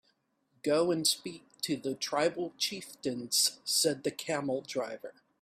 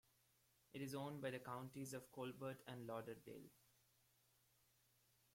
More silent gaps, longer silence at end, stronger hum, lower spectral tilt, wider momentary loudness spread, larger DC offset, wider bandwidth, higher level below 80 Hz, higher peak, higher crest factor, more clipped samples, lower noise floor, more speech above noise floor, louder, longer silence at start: neither; second, 0.3 s vs 1.75 s; neither; second, -2.5 dB/octave vs -5.5 dB/octave; about the same, 11 LU vs 11 LU; neither; about the same, 16 kHz vs 16.5 kHz; first, -76 dBFS vs -86 dBFS; first, -14 dBFS vs -34 dBFS; about the same, 20 dB vs 20 dB; neither; second, -74 dBFS vs -80 dBFS; first, 42 dB vs 28 dB; first, -31 LUFS vs -53 LUFS; about the same, 0.65 s vs 0.75 s